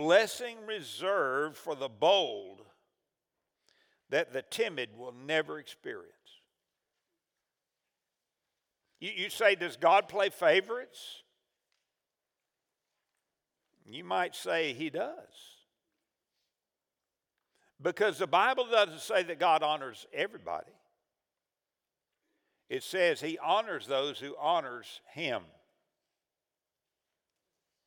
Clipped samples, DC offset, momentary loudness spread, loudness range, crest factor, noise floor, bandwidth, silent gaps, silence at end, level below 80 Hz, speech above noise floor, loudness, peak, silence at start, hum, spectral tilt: under 0.1%; under 0.1%; 17 LU; 12 LU; 24 dB; under -90 dBFS; over 20 kHz; none; 2.45 s; -88 dBFS; over 59 dB; -31 LUFS; -10 dBFS; 0 s; none; -3 dB/octave